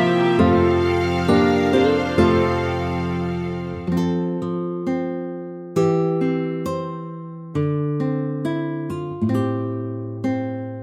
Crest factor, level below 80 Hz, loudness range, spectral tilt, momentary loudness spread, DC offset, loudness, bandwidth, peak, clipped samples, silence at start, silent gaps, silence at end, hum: 16 dB; -44 dBFS; 6 LU; -7.5 dB/octave; 11 LU; under 0.1%; -21 LUFS; 12.5 kHz; -4 dBFS; under 0.1%; 0 s; none; 0 s; none